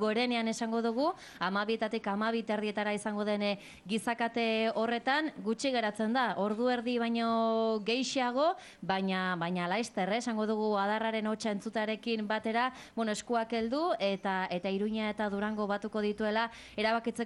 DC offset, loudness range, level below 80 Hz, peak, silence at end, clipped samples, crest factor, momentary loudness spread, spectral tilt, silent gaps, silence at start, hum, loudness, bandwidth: under 0.1%; 2 LU; -70 dBFS; -18 dBFS; 0 s; under 0.1%; 14 dB; 4 LU; -4.5 dB/octave; none; 0 s; none; -32 LUFS; 12 kHz